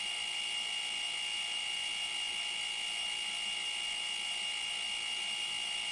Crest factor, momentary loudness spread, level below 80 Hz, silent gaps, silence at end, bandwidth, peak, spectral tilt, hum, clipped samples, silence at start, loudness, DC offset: 12 dB; 0 LU; -72 dBFS; none; 0 s; 11.5 kHz; -26 dBFS; 2.5 dB/octave; none; under 0.1%; 0 s; -34 LUFS; under 0.1%